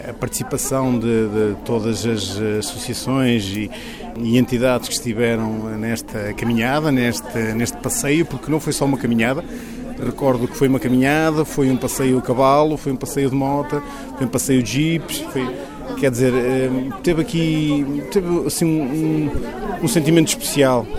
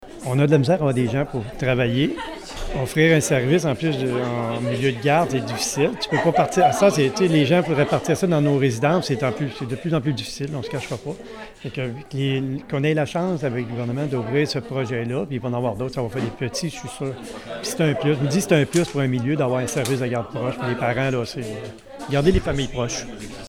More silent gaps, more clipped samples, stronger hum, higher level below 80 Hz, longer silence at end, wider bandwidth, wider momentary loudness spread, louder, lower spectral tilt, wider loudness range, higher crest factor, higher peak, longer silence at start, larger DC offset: neither; neither; neither; about the same, -40 dBFS vs -42 dBFS; about the same, 0 s vs 0 s; about the same, 17 kHz vs 16 kHz; second, 9 LU vs 12 LU; first, -19 LUFS vs -22 LUFS; about the same, -5 dB/octave vs -5.5 dB/octave; second, 3 LU vs 7 LU; about the same, 18 dB vs 16 dB; first, 0 dBFS vs -4 dBFS; about the same, 0 s vs 0 s; neither